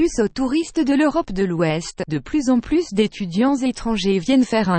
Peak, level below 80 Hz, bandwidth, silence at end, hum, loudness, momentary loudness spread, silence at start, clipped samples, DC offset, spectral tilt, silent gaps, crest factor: -4 dBFS; -42 dBFS; 8.8 kHz; 0 s; none; -20 LUFS; 5 LU; 0 s; under 0.1%; under 0.1%; -5.5 dB/octave; none; 14 dB